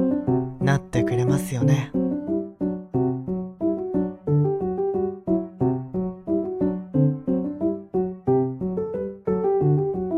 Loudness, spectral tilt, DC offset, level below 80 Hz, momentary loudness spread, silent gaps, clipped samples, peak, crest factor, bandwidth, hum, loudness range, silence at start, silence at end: -24 LUFS; -8.5 dB/octave; under 0.1%; -50 dBFS; 6 LU; none; under 0.1%; -8 dBFS; 16 dB; 13.5 kHz; none; 1 LU; 0 s; 0 s